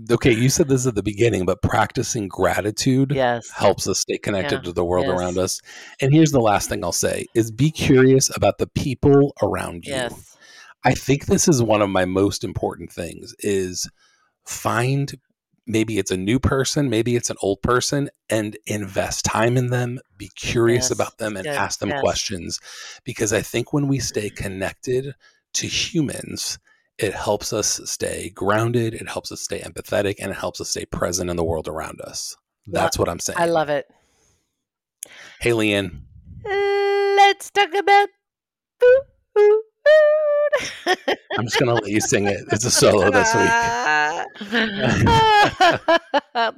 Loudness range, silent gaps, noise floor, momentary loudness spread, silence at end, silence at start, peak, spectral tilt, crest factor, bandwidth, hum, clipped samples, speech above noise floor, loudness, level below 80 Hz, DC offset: 7 LU; none; under -90 dBFS; 13 LU; 0.05 s; 0 s; -6 dBFS; -4.5 dB/octave; 14 dB; 16.5 kHz; none; under 0.1%; over 70 dB; -20 LUFS; -44 dBFS; under 0.1%